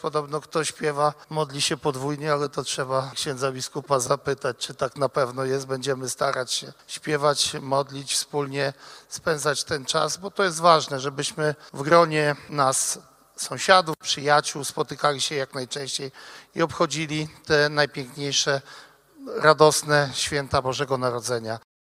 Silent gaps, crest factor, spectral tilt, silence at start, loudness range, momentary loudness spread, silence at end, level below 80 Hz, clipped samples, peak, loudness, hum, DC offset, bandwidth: none; 24 dB; -3 dB/octave; 0 s; 4 LU; 11 LU; 0.3 s; -60 dBFS; under 0.1%; 0 dBFS; -24 LUFS; none; under 0.1%; 16 kHz